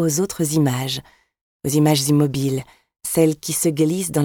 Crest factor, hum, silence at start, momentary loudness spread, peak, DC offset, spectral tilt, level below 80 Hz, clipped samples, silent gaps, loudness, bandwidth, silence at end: 16 dB; none; 0 s; 11 LU; -4 dBFS; under 0.1%; -5 dB/octave; -54 dBFS; under 0.1%; 1.41-1.60 s; -20 LUFS; 19 kHz; 0 s